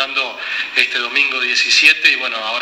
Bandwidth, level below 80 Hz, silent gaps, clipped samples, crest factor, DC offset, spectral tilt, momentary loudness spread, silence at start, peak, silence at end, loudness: over 20 kHz; -66 dBFS; none; under 0.1%; 16 dB; under 0.1%; 2 dB/octave; 10 LU; 0 s; 0 dBFS; 0 s; -13 LUFS